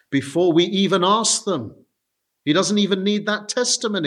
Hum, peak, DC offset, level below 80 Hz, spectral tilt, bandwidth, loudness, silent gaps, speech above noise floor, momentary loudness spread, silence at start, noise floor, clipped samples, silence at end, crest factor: none; -4 dBFS; under 0.1%; -70 dBFS; -3.5 dB/octave; 12.5 kHz; -19 LUFS; none; 58 dB; 9 LU; 0.1 s; -77 dBFS; under 0.1%; 0 s; 16 dB